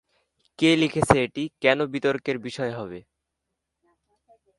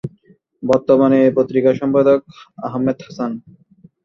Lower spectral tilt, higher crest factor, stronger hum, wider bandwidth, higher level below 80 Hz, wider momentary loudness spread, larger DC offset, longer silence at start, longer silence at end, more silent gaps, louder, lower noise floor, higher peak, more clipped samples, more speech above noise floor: second, -5 dB/octave vs -8.5 dB/octave; first, 24 dB vs 16 dB; neither; first, 11.5 kHz vs 7.2 kHz; first, -52 dBFS vs -58 dBFS; second, 12 LU vs 15 LU; neither; first, 0.6 s vs 0.05 s; first, 1.6 s vs 0.65 s; neither; second, -23 LUFS vs -16 LUFS; first, -82 dBFS vs -53 dBFS; about the same, -2 dBFS vs -2 dBFS; neither; first, 58 dB vs 37 dB